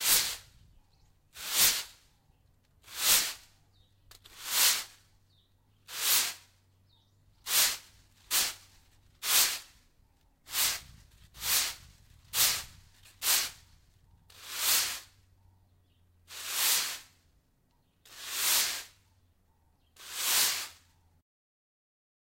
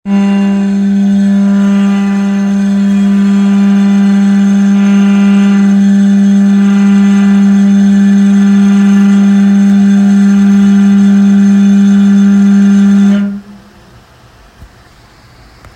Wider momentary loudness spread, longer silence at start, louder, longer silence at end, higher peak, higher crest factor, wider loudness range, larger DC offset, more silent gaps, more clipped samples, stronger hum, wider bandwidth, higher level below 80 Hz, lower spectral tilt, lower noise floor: first, 20 LU vs 4 LU; about the same, 0 s vs 0.05 s; second, -28 LUFS vs -7 LUFS; first, 1.5 s vs 1.1 s; second, -10 dBFS vs 0 dBFS; first, 24 dB vs 6 dB; about the same, 4 LU vs 3 LU; neither; neither; neither; neither; first, 16 kHz vs 8.4 kHz; second, -64 dBFS vs -46 dBFS; second, 2 dB/octave vs -7.5 dB/octave; first, -71 dBFS vs -39 dBFS